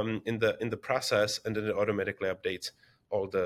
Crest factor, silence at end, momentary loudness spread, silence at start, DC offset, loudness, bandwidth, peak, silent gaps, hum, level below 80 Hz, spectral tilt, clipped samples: 20 dB; 0 s; 7 LU; 0 s; under 0.1%; -31 LUFS; 15.5 kHz; -12 dBFS; none; none; -66 dBFS; -4.5 dB/octave; under 0.1%